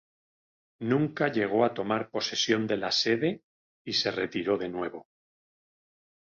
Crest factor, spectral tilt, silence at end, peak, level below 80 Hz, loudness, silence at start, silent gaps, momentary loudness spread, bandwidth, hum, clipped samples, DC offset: 20 dB; -4.5 dB/octave; 1.2 s; -10 dBFS; -68 dBFS; -28 LUFS; 0.8 s; 3.43-3.85 s; 11 LU; 7.4 kHz; none; under 0.1%; under 0.1%